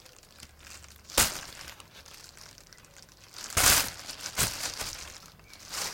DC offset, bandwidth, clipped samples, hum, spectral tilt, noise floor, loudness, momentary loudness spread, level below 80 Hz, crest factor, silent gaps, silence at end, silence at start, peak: under 0.1%; 17 kHz; under 0.1%; none; -0.5 dB/octave; -54 dBFS; -27 LUFS; 26 LU; -50 dBFS; 28 dB; none; 0 s; 0.4 s; -4 dBFS